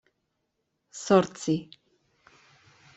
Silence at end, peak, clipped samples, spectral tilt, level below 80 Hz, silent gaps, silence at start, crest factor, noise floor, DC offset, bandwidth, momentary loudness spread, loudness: 1.35 s; -6 dBFS; under 0.1%; -5.5 dB/octave; -70 dBFS; none; 0.95 s; 24 dB; -79 dBFS; under 0.1%; 8.2 kHz; 18 LU; -26 LUFS